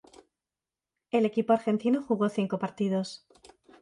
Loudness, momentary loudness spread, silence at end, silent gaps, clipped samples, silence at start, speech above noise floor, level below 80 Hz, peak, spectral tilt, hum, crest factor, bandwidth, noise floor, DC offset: -28 LUFS; 7 LU; 0.65 s; none; under 0.1%; 1.15 s; over 63 dB; -74 dBFS; -10 dBFS; -7 dB/octave; none; 20 dB; 11 kHz; under -90 dBFS; under 0.1%